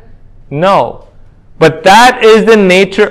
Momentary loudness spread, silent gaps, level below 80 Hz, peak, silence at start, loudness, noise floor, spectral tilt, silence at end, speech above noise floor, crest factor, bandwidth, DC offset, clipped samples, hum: 9 LU; none; -38 dBFS; 0 dBFS; 0.5 s; -6 LUFS; -36 dBFS; -4.5 dB/octave; 0 s; 30 dB; 8 dB; 16 kHz; under 0.1%; 5%; none